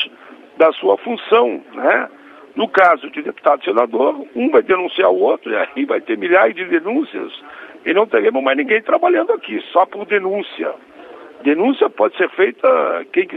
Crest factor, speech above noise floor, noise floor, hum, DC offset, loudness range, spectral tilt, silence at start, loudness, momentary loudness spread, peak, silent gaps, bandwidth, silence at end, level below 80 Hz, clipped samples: 16 dB; 25 dB; -41 dBFS; none; under 0.1%; 2 LU; -6.5 dB/octave; 0 s; -16 LUFS; 11 LU; 0 dBFS; none; 5.6 kHz; 0 s; -66 dBFS; under 0.1%